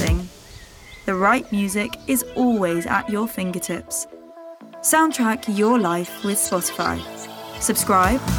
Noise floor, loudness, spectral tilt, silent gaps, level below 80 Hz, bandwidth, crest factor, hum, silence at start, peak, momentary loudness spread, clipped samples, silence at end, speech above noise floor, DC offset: -42 dBFS; -21 LUFS; -4 dB/octave; none; -38 dBFS; over 20 kHz; 18 dB; none; 0 s; -4 dBFS; 17 LU; under 0.1%; 0 s; 22 dB; under 0.1%